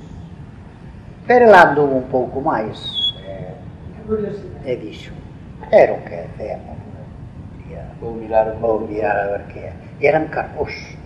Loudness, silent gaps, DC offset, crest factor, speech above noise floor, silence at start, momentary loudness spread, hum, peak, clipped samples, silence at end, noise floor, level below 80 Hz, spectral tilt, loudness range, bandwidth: -17 LUFS; none; under 0.1%; 18 dB; 20 dB; 0 s; 23 LU; none; 0 dBFS; 0.1%; 0 s; -37 dBFS; -42 dBFS; -6 dB/octave; 8 LU; 10 kHz